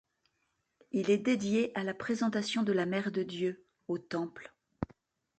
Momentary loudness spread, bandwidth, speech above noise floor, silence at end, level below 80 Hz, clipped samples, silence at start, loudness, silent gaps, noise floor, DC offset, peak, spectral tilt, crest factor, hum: 13 LU; 9 kHz; 48 dB; 0.55 s; -64 dBFS; under 0.1%; 0.95 s; -33 LUFS; none; -80 dBFS; under 0.1%; -16 dBFS; -5.5 dB/octave; 18 dB; none